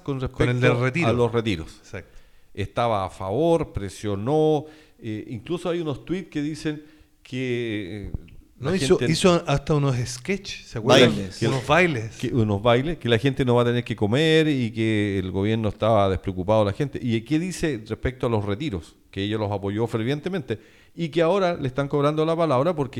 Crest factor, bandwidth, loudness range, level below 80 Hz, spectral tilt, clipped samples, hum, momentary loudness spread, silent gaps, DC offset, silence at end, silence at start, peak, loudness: 18 dB; 13.5 kHz; 6 LU; -44 dBFS; -6 dB/octave; under 0.1%; none; 13 LU; none; under 0.1%; 0 s; 0.05 s; -6 dBFS; -23 LUFS